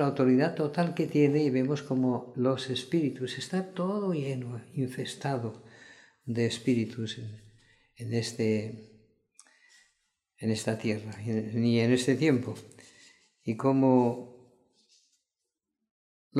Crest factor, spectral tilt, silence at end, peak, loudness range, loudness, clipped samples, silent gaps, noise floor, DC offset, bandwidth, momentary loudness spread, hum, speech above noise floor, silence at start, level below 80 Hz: 18 dB; -6.5 dB/octave; 0 s; -12 dBFS; 7 LU; -29 LUFS; under 0.1%; 15.91-16.31 s; -86 dBFS; under 0.1%; 12.5 kHz; 15 LU; none; 58 dB; 0 s; -72 dBFS